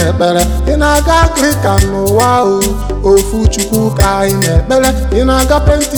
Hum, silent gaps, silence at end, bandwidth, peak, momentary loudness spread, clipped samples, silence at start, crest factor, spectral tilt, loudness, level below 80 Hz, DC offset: none; none; 0 s; over 20 kHz; 0 dBFS; 4 LU; under 0.1%; 0 s; 10 dB; -5 dB/octave; -11 LUFS; -16 dBFS; 0.2%